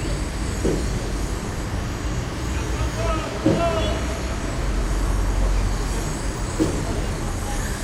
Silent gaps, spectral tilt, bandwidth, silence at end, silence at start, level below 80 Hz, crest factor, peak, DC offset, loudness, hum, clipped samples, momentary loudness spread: none; -5.5 dB/octave; 15.5 kHz; 0 s; 0 s; -26 dBFS; 16 dB; -6 dBFS; under 0.1%; -25 LUFS; none; under 0.1%; 5 LU